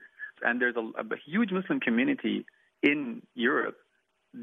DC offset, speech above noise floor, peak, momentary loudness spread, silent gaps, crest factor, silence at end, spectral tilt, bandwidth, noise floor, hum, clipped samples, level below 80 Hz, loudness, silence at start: under 0.1%; 25 dB; -10 dBFS; 9 LU; none; 20 dB; 0 s; -8 dB/octave; 3.9 kHz; -54 dBFS; none; under 0.1%; -82 dBFS; -29 LUFS; 0 s